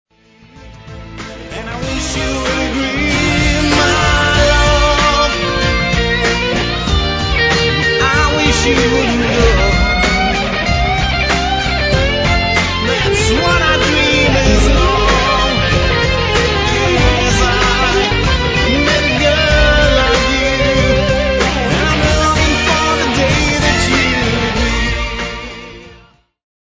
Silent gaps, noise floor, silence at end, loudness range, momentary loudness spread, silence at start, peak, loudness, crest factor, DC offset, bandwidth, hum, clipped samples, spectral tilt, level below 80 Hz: none; -45 dBFS; 0.75 s; 2 LU; 5 LU; 0.55 s; 0 dBFS; -12 LUFS; 12 dB; under 0.1%; 8 kHz; none; under 0.1%; -4 dB/octave; -20 dBFS